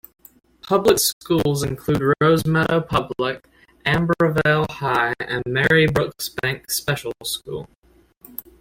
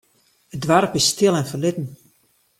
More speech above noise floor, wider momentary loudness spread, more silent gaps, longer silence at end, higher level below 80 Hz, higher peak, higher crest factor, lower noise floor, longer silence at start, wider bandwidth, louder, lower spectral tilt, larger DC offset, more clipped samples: second, 32 dB vs 43 dB; second, 10 LU vs 16 LU; first, 1.13-1.21 s, 7.78-7.82 s vs none; second, 0.2 s vs 0.65 s; first, -46 dBFS vs -58 dBFS; about the same, -4 dBFS vs -2 dBFS; about the same, 18 dB vs 20 dB; second, -52 dBFS vs -62 dBFS; about the same, 0.65 s vs 0.55 s; about the same, 16.5 kHz vs 16.5 kHz; about the same, -20 LUFS vs -19 LUFS; about the same, -4.5 dB/octave vs -4 dB/octave; neither; neither